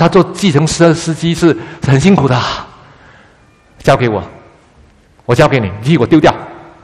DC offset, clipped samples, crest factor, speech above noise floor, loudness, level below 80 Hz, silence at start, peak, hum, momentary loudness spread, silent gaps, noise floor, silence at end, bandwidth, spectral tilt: under 0.1%; 0.4%; 12 dB; 36 dB; -11 LUFS; -38 dBFS; 0 s; 0 dBFS; none; 12 LU; none; -46 dBFS; 0.2 s; 12.5 kHz; -6 dB/octave